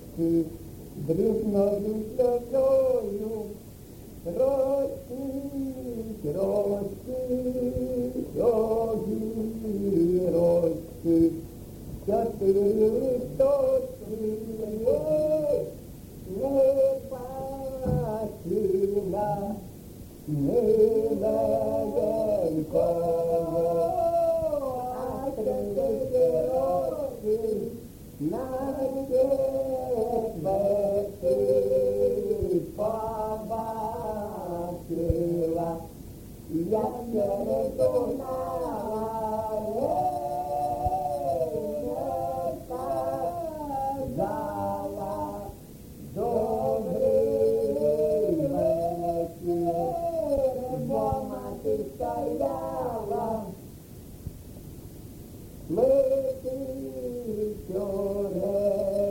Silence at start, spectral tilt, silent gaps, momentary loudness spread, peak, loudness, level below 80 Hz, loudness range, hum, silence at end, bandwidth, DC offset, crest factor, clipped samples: 0 s; -8 dB/octave; none; 12 LU; -10 dBFS; -27 LUFS; -48 dBFS; 5 LU; none; 0 s; 17 kHz; under 0.1%; 16 dB; under 0.1%